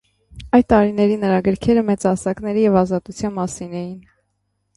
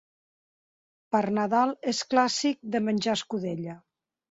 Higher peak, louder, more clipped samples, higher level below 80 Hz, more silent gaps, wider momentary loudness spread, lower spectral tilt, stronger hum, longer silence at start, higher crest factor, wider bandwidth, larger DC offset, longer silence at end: first, -2 dBFS vs -8 dBFS; first, -18 LUFS vs -27 LUFS; neither; first, -44 dBFS vs -72 dBFS; neither; first, 12 LU vs 8 LU; first, -7 dB/octave vs -4 dB/octave; neither; second, 0.35 s vs 1.1 s; about the same, 16 dB vs 20 dB; first, 11.5 kHz vs 8 kHz; neither; first, 0.75 s vs 0.5 s